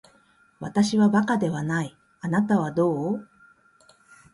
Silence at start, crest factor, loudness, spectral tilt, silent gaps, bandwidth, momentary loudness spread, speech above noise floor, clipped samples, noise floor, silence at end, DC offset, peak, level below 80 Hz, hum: 0.6 s; 16 dB; -24 LUFS; -6.5 dB/octave; none; 11.5 kHz; 13 LU; 37 dB; under 0.1%; -60 dBFS; 1.1 s; under 0.1%; -10 dBFS; -64 dBFS; none